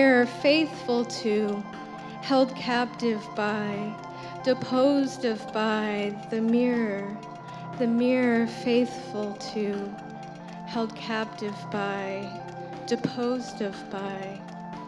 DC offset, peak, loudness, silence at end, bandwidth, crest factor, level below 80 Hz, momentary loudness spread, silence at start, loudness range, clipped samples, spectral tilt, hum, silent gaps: under 0.1%; -8 dBFS; -27 LUFS; 0 s; 11 kHz; 18 dB; -68 dBFS; 15 LU; 0 s; 6 LU; under 0.1%; -5.5 dB/octave; none; none